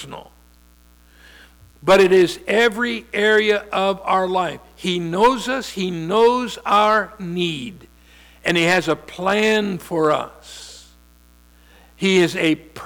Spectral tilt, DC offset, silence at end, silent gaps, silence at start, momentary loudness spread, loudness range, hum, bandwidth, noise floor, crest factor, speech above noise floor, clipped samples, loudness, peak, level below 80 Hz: -4.5 dB/octave; under 0.1%; 0 s; none; 0 s; 12 LU; 4 LU; 60 Hz at -50 dBFS; 19.5 kHz; -51 dBFS; 14 dB; 32 dB; under 0.1%; -18 LUFS; -6 dBFS; -50 dBFS